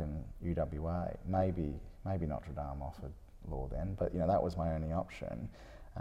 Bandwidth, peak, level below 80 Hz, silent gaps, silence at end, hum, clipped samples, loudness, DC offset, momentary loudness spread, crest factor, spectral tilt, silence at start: 10 kHz; -20 dBFS; -46 dBFS; none; 0 s; none; under 0.1%; -38 LUFS; under 0.1%; 14 LU; 18 dB; -9.5 dB/octave; 0 s